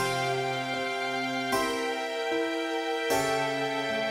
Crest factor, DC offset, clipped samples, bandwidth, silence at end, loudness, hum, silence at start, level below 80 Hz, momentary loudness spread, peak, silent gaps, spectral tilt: 16 dB; under 0.1%; under 0.1%; 16 kHz; 0 s; -29 LUFS; none; 0 s; -64 dBFS; 3 LU; -12 dBFS; none; -3.5 dB/octave